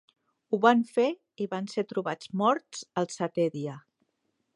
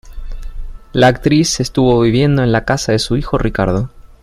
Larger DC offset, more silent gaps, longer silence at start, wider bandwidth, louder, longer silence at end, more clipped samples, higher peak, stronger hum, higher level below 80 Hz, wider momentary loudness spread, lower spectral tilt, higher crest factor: neither; neither; first, 0.5 s vs 0.05 s; second, 11 kHz vs 14.5 kHz; second, -29 LUFS vs -14 LUFS; first, 0.75 s vs 0.15 s; neither; second, -6 dBFS vs 0 dBFS; neither; second, -80 dBFS vs -28 dBFS; second, 13 LU vs 21 LU; about the same, -5.5 dB/octave vs -5.5 dB/octave; first, 24 dB vs 14 dB